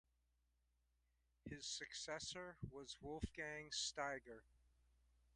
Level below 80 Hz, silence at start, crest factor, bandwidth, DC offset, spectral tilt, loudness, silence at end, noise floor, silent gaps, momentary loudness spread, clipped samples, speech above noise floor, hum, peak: -66 dBFS; 1.45 s; 22 dB; 11 kHz; under 0.1%; -2.5 dB/octave; -49 LUFS; 0.8 s; -84 dBFS; none; 12 LU; under 0.1%; 33 dB; none; -30 dBFS